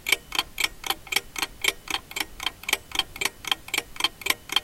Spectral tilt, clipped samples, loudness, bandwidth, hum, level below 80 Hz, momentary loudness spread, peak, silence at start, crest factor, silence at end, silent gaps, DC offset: 0.5 dB/octave; under 0.1%; -27 LUFS; 17 kHz; none; -50 dBFS; 6 LU; -2 dBFS; 0 s; 26 dB; 0 s; none; 0.1%